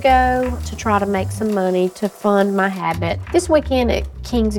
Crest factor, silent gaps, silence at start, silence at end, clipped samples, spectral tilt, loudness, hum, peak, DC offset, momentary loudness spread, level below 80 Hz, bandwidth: 16 dB; none; 0 s; 0 s; under 0.1%; -6 dB/octave; -18 LUFS; none; -2 dBFS; under 0.1%; 6 LU; -30 dBFS; 17.5 kHz